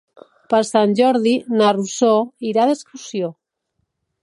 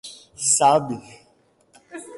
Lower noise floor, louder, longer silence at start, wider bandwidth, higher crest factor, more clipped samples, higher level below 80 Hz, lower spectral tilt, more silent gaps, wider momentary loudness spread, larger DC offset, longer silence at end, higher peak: first, -73 dBFS vs -60 dBFS; about the same, -17 LUFS vs -18 LUFS; first, 0.5 s vs 0.05 s; about the same, 11.5 kHz vs 11.5 kHz; about the same, 16 dB vs 18 dB; neither; about the same, -70 dBFS vs -66 dBFS; first, -5 dB/octave vs -2.5 dB/octave; neither; second, 10 LU vs 24 LU; neither; first, 0.9 s vs 0 s; first, -2 dBFS vs -6 dBFS